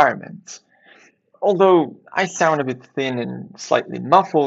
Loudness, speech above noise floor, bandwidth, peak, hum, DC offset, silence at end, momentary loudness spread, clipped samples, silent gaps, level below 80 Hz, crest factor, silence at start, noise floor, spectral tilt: -19 LUFS; 34 dB; 8 kHz; 0 dBFS; none; under 0.1%; 0 s; 19 LU; under 0.1%; none; -70 dBFS; 20 dB; 0 s; -53 dBFS; -5 dB/octave